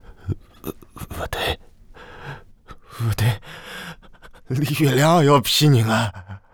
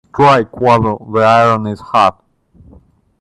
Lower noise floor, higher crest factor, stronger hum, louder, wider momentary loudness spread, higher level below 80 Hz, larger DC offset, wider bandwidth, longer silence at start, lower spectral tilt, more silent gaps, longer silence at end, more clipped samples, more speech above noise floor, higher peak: about the same, -44 dBFS vs -45 dBFS; about the same, 18 dB vs 14 dB; neither; second, -20 LUFS vs -12 LUFS; first, 23 LU vs 7 LU; about the same, -44 dBFS vs -46 dBFS; neither; first, over 20 kHz vs 11.5 kHz; about the same, 0.1 s vs 0.15 s; about the same, -5.5 dB/octave vs -6.5 dB/octave; neither; second, 0.15 s vs 1.1 s; neither; second, 27 dB vs 34 dB; second, -4 dBFS vs 0 dBFS